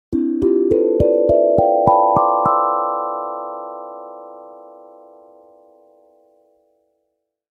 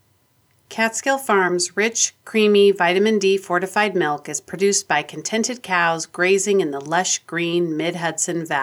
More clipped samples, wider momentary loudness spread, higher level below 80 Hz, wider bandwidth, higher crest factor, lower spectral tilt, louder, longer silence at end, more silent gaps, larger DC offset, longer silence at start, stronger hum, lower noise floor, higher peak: neither; first, 21 LU vs 6 LU; first, -42 dBFS vs -74 dBFS; second, 3.8 kHz vs 17.5 kHz; about the same, 18 dB vs 16 dB; first, -11 dB/octave vs -3 dB/octave; first, -16 LUFS vs -19 LUFS; first, 2.9 s vs 0 s; neither; neither; second, 0.1 s vs 0.7 s; neither; first, -73 dBFS vs -61 dBFS; first, 0 dBFS vs -4 dBFS